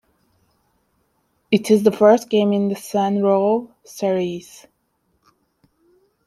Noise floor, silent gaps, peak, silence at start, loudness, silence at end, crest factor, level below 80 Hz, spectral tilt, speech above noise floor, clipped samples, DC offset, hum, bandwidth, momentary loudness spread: -68 dBFS; none; -2 dBFS; 1.5 s; -18 LUFS; 1.85 s; 18 dB; -66 dBFS; -6 dB/octave; 50 dB; under 0.1%; under 0.1%; none; 13.5 kHz; 11 LU